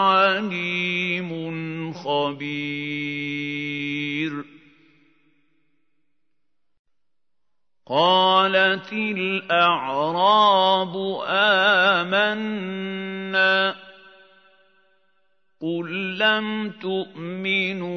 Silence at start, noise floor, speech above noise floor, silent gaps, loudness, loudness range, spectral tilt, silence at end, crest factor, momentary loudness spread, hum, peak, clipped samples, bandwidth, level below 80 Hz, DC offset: 0 s; -85 dBFS; 64 dB; 6.79-6.84 s; -21 LUFS; 11 LU; -5.5 dB/octave; 0 s; 18 dB; 13 LU; none; -4 dBFS; under 0.1%; 6.6 kHz; -76 dBFS; under 0.1%